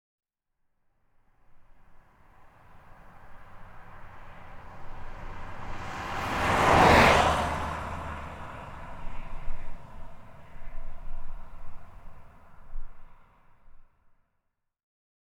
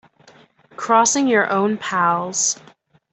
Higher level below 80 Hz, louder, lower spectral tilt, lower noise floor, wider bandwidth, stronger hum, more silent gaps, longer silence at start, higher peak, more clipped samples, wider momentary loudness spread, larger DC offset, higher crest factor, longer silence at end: first, -40 dBFS vs -68 dBFS; second, -24 LUFS vs -18 LUFS; first, -4.5 dB/octave vs -2.5 dB/octave; first, -78 dBFS vs -51 dBFS; first, 16 kHz vs 8.6 kHz; neither; neither; first, 1.55 s vs 0.8 s; second, -6 dBFS vs -2 dBFS; neither; first, 30 LU vs 5 LU; neither; first, 24 dB vs 18 dB; first, 1.4 s vs 0.6 s